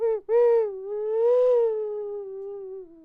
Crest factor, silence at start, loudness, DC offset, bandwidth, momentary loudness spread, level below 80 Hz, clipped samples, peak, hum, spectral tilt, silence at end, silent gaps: 10 dB; 0 s; -23 LUFS; under 0.1%; 3.8 kHz; 16 LU; -66 dBFS; under 0.1%; -14 dBFS; none; -6 dB/octave; 0.1 s; none